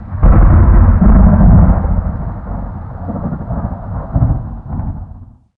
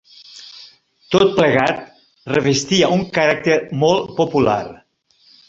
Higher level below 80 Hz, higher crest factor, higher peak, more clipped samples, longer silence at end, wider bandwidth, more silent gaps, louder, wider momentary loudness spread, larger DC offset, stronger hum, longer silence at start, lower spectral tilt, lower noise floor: first, -14 dBFS vs -52 dBFS; second, 10 dB vs 18 dB; about the same, 0 dBFS vs 0 dBFS; neither; second, 0.35 s vs 0.75 s; second, 2.4 kHz vs 7.8 kHz; neither; first, -12 LUFS vs -17 LUFS; second, 16 LU vs 19 LU; neither; neither; second, 0 s vs 0.35 s; first, -14.5 dB/octave vs -5 dB/octave; second, -35 dBFS vs -56 dBFS